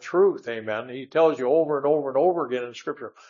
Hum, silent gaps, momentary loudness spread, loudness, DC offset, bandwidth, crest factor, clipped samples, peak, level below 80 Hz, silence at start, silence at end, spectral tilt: none; none; 11 LU; -24 LUFS; under 0.1%; 7.4 kHz; 16 dB; under 0.1%; -8 dBFS; -82 dBFS; 0 s; 0.2 s; -6.5 dB/octave